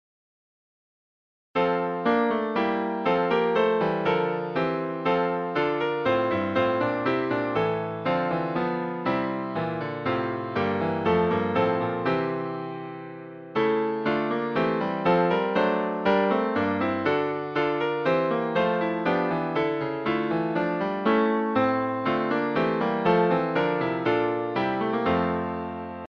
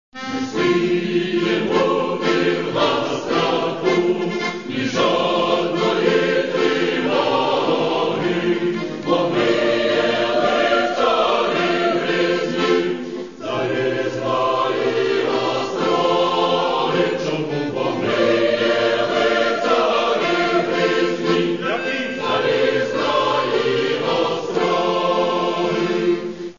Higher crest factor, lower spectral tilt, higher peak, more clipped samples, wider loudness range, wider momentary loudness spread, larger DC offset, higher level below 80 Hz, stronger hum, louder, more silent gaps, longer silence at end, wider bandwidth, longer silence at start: about the same, 16 dB vs 16 dB; first, -8 dB/octave vs -5 dB/octave; second, -10 dBFS vs -4 dBFS; neither; about the same, 3 LU vs 2 LU; about the same, 6 LU vs 5 LU; second, under 0.1% vs 0.4%; about the same, -60 dBFS vs -58 dBFS; neither; second, -25 LUFS vs -19 LUFS; neither; about the same, 0.05 s vs 0.05 s; second, 6.4 kHz vs 7.4 kHz; first, 1.55 s vs 0.15 s